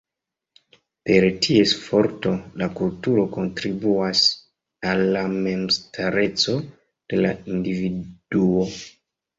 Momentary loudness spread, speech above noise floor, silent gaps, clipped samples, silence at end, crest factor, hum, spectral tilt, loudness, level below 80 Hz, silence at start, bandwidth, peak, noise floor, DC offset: 11 LU; 65 dB; none; under 0.1%; 0.5 s; 18 dB; none; -5 dB/octave; -21 LUFS; -54 dBFS; 1.05 s; 7.8 kHz; -4 dBFS; -86 dBFS; under 0.1%